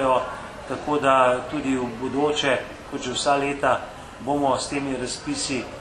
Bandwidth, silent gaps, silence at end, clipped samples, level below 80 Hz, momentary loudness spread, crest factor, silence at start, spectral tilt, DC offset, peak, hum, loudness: 12 kHz; none; 0 s; under 0.1%; -50 dBFS; 13 LU; 20 dB; 0 s; -4 dB/octave; under 0.1%; -4 dBFS; none; -24 LUFS